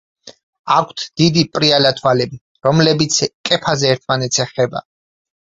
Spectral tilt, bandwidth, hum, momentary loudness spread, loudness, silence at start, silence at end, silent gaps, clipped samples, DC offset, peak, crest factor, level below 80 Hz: -4 dB/octave; 8 kHz; none; 7 LU; -15 LUFS; 0.25 s; 0.75 s; 0.43-0.53 s, 0.59-0.64 s, 2.41-2.55 s, 3.34-3.44 s; under 0.1%; under 0.1%; 0 dBFS; 16 dB; -52 dBFS